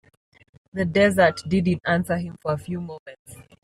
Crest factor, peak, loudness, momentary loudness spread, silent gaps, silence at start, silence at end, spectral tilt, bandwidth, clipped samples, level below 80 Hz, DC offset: 18 dB; -6 dBFS; -22 LUFS; 18 LU; 2.99-3.06 s, 3.19-3.25 s; 0.75 s; 0.2 s; -6.5 dB/octave; 14 kHz; under 0.1%; -56 dBFS; under 0.1%